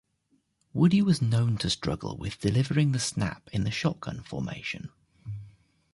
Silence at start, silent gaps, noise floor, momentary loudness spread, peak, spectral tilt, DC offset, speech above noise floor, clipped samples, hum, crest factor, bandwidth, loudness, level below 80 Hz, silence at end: 0.75 s; none; -71 dBFS; 18 LU; -10 dBFS; -5.5 dB/octave; under 0.1%; 44 dB; under 0.1%; none; 18 dB; 11.5 kHz; -28 LUFS; -50 dBFS; 0.45 s